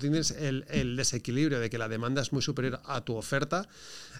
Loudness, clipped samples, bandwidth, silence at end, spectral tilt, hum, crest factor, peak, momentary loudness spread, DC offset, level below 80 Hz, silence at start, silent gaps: -31 LUFS; under 0.1%; 16 kHz; 0 s; -4.5 dB/octave; none; 18 dB; -14 dBFS; 6 LU; 0.4%; -52 dBFS; 0 s; none